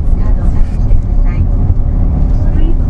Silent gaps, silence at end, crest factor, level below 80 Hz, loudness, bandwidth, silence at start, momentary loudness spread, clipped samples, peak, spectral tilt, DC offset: none; 0 s; 8 dB; -10 dBFS; -15 LUFS; 3 kHz; 0 s; 2 LU; under 0.1%; 0 dBFS; -10 dB/octave; under 0.1%